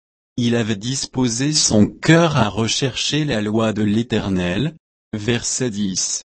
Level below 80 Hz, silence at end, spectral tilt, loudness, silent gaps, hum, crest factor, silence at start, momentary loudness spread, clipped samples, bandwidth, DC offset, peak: -46 dBFS; 0.1 s; -4 dB/octave; -18 LUFS; 4.80-5.11 s; none; 18 dB; 0.35 s; 8 LU; under 0.1%; 8.8 kHz; under 0.1%; 0 dBFS